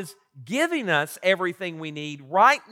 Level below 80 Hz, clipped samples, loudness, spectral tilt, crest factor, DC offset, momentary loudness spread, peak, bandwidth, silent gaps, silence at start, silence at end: -84 dBFS; under 0.1%; -23 LUFS; -4 dB/octave; 18 dB; under 0.1%; 15 LU; -6 dBFS; 16.5 kHz; none; 0 s; 0.1 s